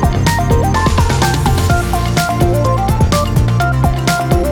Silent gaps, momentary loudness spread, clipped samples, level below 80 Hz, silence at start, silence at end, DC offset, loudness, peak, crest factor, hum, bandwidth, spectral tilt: none; 2 LU; under 0.1%; -20 dBFS; 0 s; 0 s; under 0.1%; -13 LUFS; -2 dBFS; 10 dB; none; 20 kHz; -5.5 dB/octave